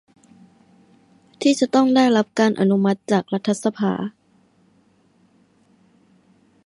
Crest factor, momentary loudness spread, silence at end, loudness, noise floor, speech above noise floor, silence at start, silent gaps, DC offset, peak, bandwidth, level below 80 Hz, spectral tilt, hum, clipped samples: 18 dB; 8 LU; 2.55 s; -19 LUFS; -59 dBFS; 41 dB; 1.4 s; none; under 0.1%; -4 dBFS; 11.5 kHz; -68 dBFS; -5.5 dB/octave; none; under 0.1%